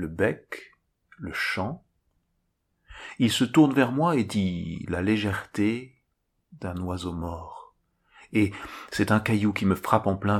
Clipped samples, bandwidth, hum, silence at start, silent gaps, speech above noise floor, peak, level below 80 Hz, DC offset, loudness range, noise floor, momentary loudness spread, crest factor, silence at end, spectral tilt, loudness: under 0.1%; 15.5 kHz; none; 0 s; none; 50 dB; -4 dBFS; -54 dBFS; under 0.1%; 8 LU; -75 dBFS; 18 LU; 22 dB; 0 s; -6 dB/octave; -26 LUFS